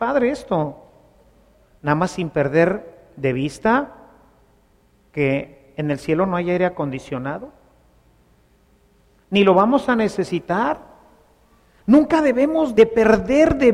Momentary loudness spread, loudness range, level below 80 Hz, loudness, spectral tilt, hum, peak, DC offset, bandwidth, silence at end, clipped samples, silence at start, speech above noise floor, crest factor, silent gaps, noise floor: 14 LU; 6 LU; -46 dBFS; -19 LUFS; -7 dB/octave; none; -2 dBFS; under 0.1%; 12 kHz; 0 s; under 0.1%; 0 s; 39 dB; 18 dB; none; -57 dBFS